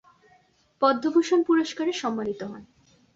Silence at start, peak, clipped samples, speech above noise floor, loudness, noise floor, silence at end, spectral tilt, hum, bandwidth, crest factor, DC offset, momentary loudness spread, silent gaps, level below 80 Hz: 0.8 s; -8 dBFS; under 0.1%; 38 dB; -24 LUFS; -62 dBFS; 0.5 s; -4.5 dB/octave; none; 7.8 kHz; 18 dB; under 0.1%; 14 LU; none; -70 dBFS